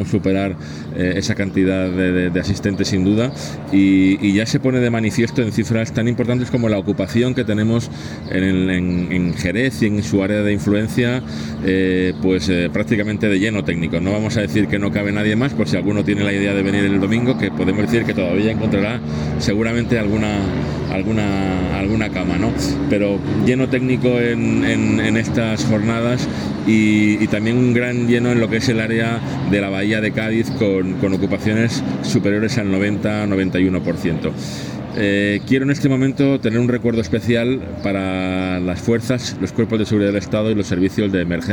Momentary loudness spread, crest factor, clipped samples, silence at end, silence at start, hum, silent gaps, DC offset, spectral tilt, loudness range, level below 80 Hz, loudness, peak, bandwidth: 4 LU; 14 dB; under 0.1%; 0 s; 0 s; none; none; under 0.1%; -6.5 dB/octave; 2 LU; -42 dBFS; -18 LUFS; -4 dBFS; 18 kHz